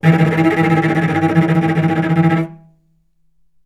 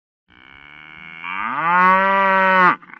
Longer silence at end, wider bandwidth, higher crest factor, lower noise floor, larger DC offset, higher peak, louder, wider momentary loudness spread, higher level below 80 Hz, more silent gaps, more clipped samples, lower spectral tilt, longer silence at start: first, 1.1 s vs 0.25 s; first, 9.8 kHz vs 6.6 kHz; about the same, 14 dB vs 16 dB; first, -62 dBFS vs -44 dBFS; neither; about the same, 0 dBFS vs -2 dBFS; about the same, -14 LUFS vs -15 LUFS; second, 3 LU vs 19 LU; first, -54 dBFS vs -64 dBFS; neither; neither; first, -8.5 dB/octave vs -6.5 dB/octave; second, 0.05 s vs 0.9 s